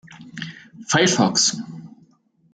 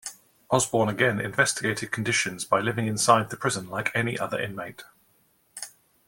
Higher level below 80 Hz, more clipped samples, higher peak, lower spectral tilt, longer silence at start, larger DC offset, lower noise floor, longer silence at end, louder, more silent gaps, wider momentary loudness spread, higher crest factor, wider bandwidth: about the same, -64 dBFS vs -62 dBFS; neither; about the same, -2 dBFS vs -4 dBFS; about the same, -3 dB/octave vs -3.5 dB/octave; about the same, 0.1 s vs 0.05 s; neither; second, -58 dBFS vs -65 dBFS; first, 0.65 s vs 0.4 s; first, -18 LUFS vs -25 LUFS; neither; first, 23 LU vs 18 LU; about the same, 20 dB vs 22 dB; second, 10 kHz vs 17 kHz